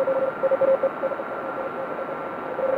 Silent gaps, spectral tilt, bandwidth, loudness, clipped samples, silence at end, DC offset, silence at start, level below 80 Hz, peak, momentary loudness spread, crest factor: none; -7.5 dB/octave; 4.6 kHz; -25 LUFS; under 0.1%; 0 s; under 0.1%; 0 s; -68 dBFS; -10 dBFS; 10 LU; 14 dB